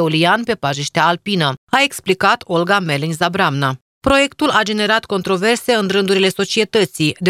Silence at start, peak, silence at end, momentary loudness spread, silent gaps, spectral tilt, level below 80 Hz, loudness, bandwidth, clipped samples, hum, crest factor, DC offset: 0 s; 0 dBFS; 0 s; 4 LU; 1.58-1.67 s, 3.81-4.01 s; -4.5 dB/octave; -46 dBFS; -16 LUFS; 16 kHz; under 0.1%; none; 16 dB; under 0.1%